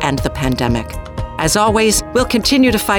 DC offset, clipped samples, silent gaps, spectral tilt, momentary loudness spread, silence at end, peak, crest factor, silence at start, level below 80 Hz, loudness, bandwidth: under 0.1%; under 0.1%; none; -4 dB/octave; 11 LU; 0 s; -2 dBFS; 12 dB; 0 s; -28 dBFS; -15 LUFS; over 20 kHz